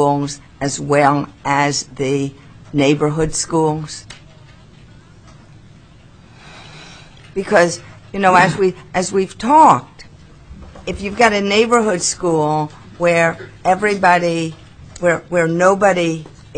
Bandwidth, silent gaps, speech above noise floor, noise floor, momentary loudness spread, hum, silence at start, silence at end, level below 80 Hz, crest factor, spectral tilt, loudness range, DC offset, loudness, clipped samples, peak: 10.5 kHz; none; 28 dB; -44 dBFS; 15 LU; none; 0 s; 0 s; -44 dBFS; 18 dB; -4.5 dB/octave; 8 LU; 0.2%; -16 LUFS; under 0.1%; 0 dBFS